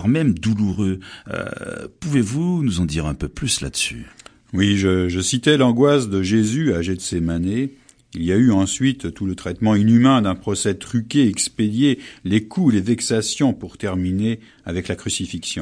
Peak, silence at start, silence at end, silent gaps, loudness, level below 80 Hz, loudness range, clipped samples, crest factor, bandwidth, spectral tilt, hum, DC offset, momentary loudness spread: 0 dBFS; 0 s; 0 s; none; -20 LUFS; -42 dBFS; 4 LU; under 0.1%; 18 dB; 10.5 kHz; -5 dB/octave; none; under 0.1%; 12 LU